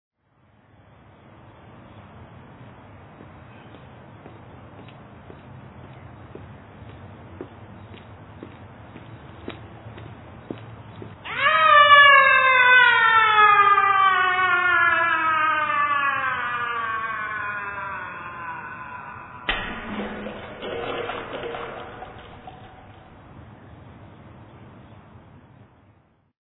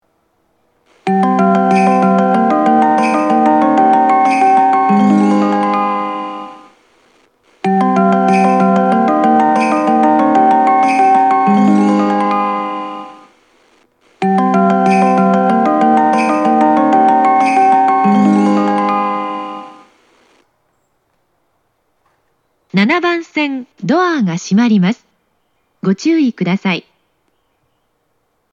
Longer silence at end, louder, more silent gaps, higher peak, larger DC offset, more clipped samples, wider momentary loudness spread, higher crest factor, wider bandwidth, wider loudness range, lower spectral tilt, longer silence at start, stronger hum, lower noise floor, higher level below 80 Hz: first, 2 s vs 1.7 s; second, -18 LUFS vs -12 LUFS; neither; about the same, 0 dBFS vs 0 dBFS; neither; neither; first, 28 LU vs 9 LU; first, 22 dB vs 12 dB; second, 4.1 kHz vs 10.5 kHz; first, 27 LU vs 8 LU; about the same, -6 dB/octave vs -7 dB/octave; first, 1.95 s vs 1.05 s; neither; second, -60 dBFS vs -64 dBFS; first, -54 dBFS vs -60 dBFS